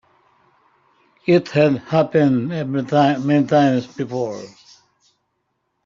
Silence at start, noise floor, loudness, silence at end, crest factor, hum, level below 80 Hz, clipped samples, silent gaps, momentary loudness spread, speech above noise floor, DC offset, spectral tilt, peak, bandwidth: 1.25 s; -72 dBFS; -18 LUFS; 1.4 s; 18 dB; none; -62 dBFS; under 0.1%; none; 11 LU; 55 dB; under 0.1%; -7.5 dB/octave; -2 dBFS; 7.4 kHz